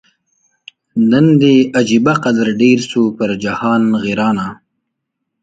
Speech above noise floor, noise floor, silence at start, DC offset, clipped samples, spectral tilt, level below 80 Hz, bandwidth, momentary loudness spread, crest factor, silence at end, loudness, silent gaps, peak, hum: 62 dB; -74 dBFS; 0.95 s; under 0.1%; under 0.1%; -6.5 dB/octave; -54 dBFS; 9 kHz; 8 LU; 14 dB; 0.9 s; -13 LUFS; none; 0 dBFS; none